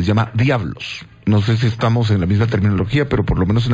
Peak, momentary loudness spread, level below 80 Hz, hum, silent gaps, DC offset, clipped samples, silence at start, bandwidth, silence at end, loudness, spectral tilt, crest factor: -4 dBFS; 7 LU; -32 dBFS; none; none; under 0.1%; under 0.1%; 0 s; 7.8 kHz; 0 s; -17 LUFS; -7.5 dB/octave; 12 dB